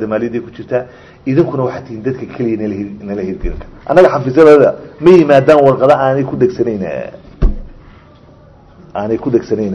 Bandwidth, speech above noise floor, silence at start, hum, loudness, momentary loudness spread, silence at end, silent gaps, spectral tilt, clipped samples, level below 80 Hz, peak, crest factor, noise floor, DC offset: 8.4 kHz; 29 dB; 0 s; none; -12 LUFS; 17 LU; 0 s; none; -8 dB/octave; 2%; -28 dBFS; 0 dBFS; 12 dB; -41 dBFS; under 0.1%